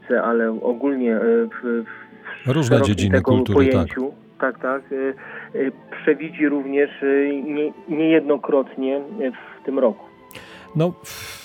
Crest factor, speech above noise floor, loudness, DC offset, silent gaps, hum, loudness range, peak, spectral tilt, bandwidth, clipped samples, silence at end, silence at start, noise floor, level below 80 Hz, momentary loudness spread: 18 dB; 21 dB; -21 LUFS; under 0.1%; none; none; 3 LU; -2 dBFS; -7 dB/octave; 17 kHz; under 0.1%; 0 s; 0.05 s; -41 dBFS; -54 dBFS; 15 LU